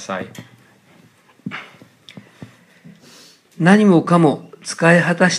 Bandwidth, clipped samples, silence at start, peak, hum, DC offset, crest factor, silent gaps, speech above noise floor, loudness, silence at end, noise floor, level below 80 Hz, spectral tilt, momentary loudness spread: 11.5 kHz; under 0.1%; 0 s; 0 dBFS; none; under 0.1%; 18 dB; none; 37 dB; -14 LUFS; 0 s; -51 dBFS; -68 dBFS; -6 dB/octave; 20 LU